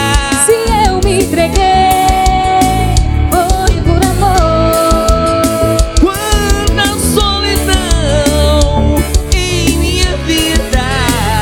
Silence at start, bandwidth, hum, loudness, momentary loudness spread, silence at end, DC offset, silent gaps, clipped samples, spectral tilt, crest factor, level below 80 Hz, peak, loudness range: 0 s; 18.5 kHz; none; -11 LUFS; 3 LU; 0 s; under 0.1%; none; 0.2%; -4.5 dB/octave; 10 dB; -14 dBFS; 0 dBFS; 1 LU